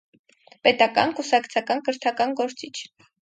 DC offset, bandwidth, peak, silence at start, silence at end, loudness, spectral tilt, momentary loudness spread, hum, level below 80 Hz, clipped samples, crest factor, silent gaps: under 0.1%; 9.2 kHz; -2 dBFS; 0.65 s; 0.4 s; -22 LUFS; -3 dB/octave; 16 LU; none; -70 dBFS; under 0.1%; 22 dB; none